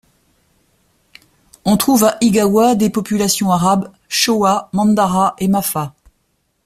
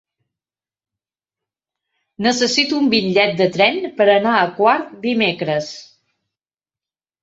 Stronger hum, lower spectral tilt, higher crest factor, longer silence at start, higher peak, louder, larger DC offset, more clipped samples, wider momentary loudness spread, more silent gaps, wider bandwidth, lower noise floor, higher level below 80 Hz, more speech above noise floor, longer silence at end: neither; about the same, -4.5 dB/octave vs -4 dB/octave; about the same, 16 dB vs 18 dB; second, 1.65 s vs 2.2 s; about the same, 0 dBFS vs 0 dBFS; about the same, -15 LUFS vs -16 LUFS; neither; neither; about the same, 7 LU vs 7 LU; neither; first, 16 kHz vs 8 kHz; second, -65 dBFS vs under -90 dBFS; first, -50 dBFS vs -62 dBFS; second, 51 dB vs over 74 dB; second, 0.75 s vs 1.4 s